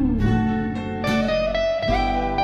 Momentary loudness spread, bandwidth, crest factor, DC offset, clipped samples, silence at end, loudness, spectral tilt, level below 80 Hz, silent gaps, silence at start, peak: 5 LU; 12.5 kHz; 12 dB; under 0.1%; under 0.1%; 0 s; -22 LUFS; -7 dB/octave; -30 dBFS; none; 0 s; -8 dBFS